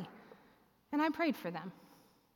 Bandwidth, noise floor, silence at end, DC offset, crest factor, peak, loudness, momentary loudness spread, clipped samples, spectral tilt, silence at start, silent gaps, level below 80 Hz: 17 kHz; -68 dBFS; 0.5 s; under 0.1%; 16 dB; -22 dBFS; -37 LUFS; 18 LU; under 0.1%; -6 dB/octave; 0 s; none; -82 dBFS